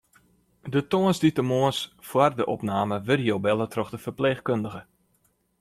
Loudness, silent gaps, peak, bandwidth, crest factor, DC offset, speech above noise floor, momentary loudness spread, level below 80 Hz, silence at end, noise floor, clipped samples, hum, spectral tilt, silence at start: -25 LUFS; none; -6 dBFS; 15.5 kHz; 20 dB; under 0.1%; 44 dB; 9 LU; -62 dBFS; 0.8 s; -68 dBFS; under 0.1%; none; -6 dB/octave; 0.65 s